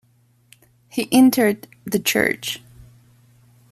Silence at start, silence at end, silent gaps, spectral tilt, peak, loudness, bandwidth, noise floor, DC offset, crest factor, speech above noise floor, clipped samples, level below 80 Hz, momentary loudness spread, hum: 0.95 s; 1.15 s; none; -3.5 dB/octave; -4 dBFS; -19 LUFS; 15 kHz; -59 dBFS; under 0.1%; 18 dB; 41 dB; under 0.1%; -58 dBFS; 15 LU; none